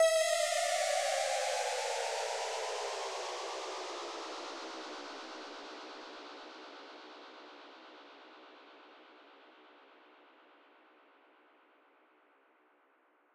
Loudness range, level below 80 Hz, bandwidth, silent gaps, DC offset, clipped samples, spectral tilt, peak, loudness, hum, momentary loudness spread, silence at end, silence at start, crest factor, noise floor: 24 LU; -90 dBFS; 16 kHz; none; under 0.1%; under 0.1%; 2 dB/octave; -20 dBFS; -36 LUFS; none; 24 LU; 3.05 s; 0 s; 20 dB; -70 dBFS